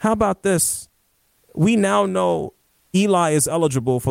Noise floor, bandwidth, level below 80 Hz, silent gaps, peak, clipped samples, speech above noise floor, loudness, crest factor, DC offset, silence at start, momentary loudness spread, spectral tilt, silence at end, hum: -64 dBFS; 16.5 kHz; -50 dBFS; none; -6 dBFS; under 0.1%; 45 dB; -19 LUFS; 14 dB; under 0.1%; 0 s; 8 LU; -5 dB/octave; 0 s; none